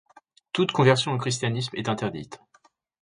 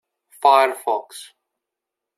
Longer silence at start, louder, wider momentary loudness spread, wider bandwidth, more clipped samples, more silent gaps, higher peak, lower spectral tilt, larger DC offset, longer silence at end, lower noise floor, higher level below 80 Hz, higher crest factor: first, 0.55 s vs 0.4 s; second, -25 LUFS vs -18 LUFS; second, 12 LU vs 23 LU; second, 10.5 kHz vs 14 kHz; neither; neither; second, -6 dBFS vs -2 dBFS; first, -5 dB/octave vs 0 dB/octave; neither; second, 0.65 s vs 0.95 s; second, -62 dBFS vs -84 dBFS; first, -62 dBFS vs -86 dBFS; about the same, 20 dB vs 20 dB